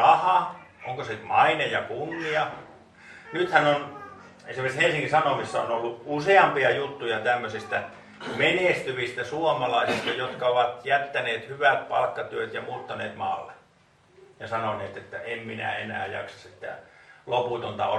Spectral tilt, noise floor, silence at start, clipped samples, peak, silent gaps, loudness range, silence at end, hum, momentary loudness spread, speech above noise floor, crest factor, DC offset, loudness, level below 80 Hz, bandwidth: -4.5 dB/octave; -60 dBFS; 0 s; under 0.1%; -2 dBFS; none; 9 LU; 0 s; none; 17 LU; 34 dB; 24 dB; under 0.1%; -26 LUFS; -66 dBFS; 12 kHz